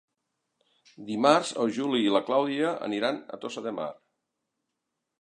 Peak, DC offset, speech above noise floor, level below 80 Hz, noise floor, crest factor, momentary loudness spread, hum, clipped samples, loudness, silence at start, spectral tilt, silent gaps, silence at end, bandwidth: -6 dBFS; under 0.1%; 56 dB; -80 dBFS; -83 dBFS; 24 dB; 14 LU; none; under 0.1%; -27 LUFS; 1 s; -4.5 dB/octave; none; 1.3 s; 11 kHz